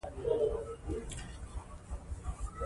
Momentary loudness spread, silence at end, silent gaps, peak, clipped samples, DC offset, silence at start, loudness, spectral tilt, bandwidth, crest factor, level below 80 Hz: 14 LU; 0 s; none; -20 dBFS; under 0.1%; under 0.1%; 0.05 s; -39 LUFS; -6 dB/octave; 11.5 kHz; 18 dB; -44 dBFS